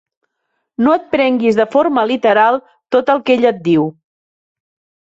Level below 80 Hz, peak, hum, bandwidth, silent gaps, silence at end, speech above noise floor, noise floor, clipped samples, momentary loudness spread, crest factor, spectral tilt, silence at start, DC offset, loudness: -60 dBFS; -2 dBFS; none; 7.8 kHz; none; 1.1 s; 58 dB; -71 dBFS; under 0.1%; 5 LU; 14 dB; -7 dB/octave; 0.8 s; under 0.1%; -14 LUFS